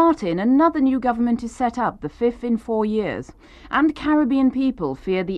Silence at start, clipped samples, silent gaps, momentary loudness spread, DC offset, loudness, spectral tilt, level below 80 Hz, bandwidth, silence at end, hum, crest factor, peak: 0 s; under 0.1%; none; 8 LU; under 0.1%; -21 LUFS; -7 dB/octave; -46 dBFS; 9.4 kHz; 0 s; none; 14 dB; -6 dBFS